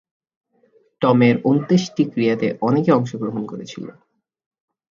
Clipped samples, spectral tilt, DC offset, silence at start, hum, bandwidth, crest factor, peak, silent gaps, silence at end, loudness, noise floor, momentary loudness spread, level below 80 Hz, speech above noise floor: under 0.1%; -7 dB/octave; under 0.1%; 1 s; none; 7.4 kHz; 20 dB; 0 dBFS; none; 1 s; -18 LUFS; -59 dBFS; 16 LU; -64 dBFS; 41 dB